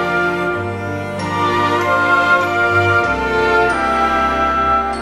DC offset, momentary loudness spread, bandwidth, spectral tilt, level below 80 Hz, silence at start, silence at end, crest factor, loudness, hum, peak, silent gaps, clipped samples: under 0.1%; 8 LU; 14.5 kHz; -5.5 dB/octave; -36 dBFS; 0 s; 0 s; 14 dB; -15 LUFS; none; -2 dBFS; none; under 0.1%